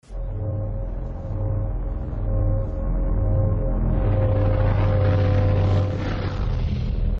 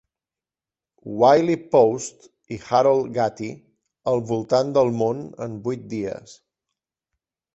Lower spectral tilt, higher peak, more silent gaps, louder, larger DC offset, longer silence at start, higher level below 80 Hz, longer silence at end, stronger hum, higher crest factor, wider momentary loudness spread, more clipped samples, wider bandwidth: first, -9.5 dB/octave vs -6 dB/octave; second, -10 dBFS vs -4 dBFS; neither; second, -24 LUFS vs -21 LUFS; neither; second, 0.1 s vs 1.05 s; first, -26 dBFS vs -62 dBFS; second, 0 s vs 1.25 s; neither; second, 12 dB vs 20 dB; second, 10 LU vs 17 LU; neither; second, 5.6 kHz vs 8.2 kHz